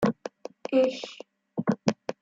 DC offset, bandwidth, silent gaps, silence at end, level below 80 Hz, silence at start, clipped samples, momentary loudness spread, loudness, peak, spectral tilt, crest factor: under 0.1%; 7.8 kHz; none; 0.1 s; -68 dBFS; 0 s; under 0.1%; 16 LU; -28 LUFS; -6 dBFS; -6 dB/octave; 22 dB